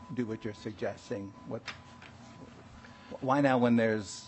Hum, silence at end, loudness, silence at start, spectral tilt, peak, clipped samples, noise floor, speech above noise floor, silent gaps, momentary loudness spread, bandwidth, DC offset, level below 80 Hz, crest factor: none; 0 s; -32 LUFS; 0 s; -6 dB/octave; -12 dBFS; under 0.1%; -52 dBFS; 20 dB; none; 25 LU; 8.4 kHz; under 0.1%; -68 dBFS; 20 dB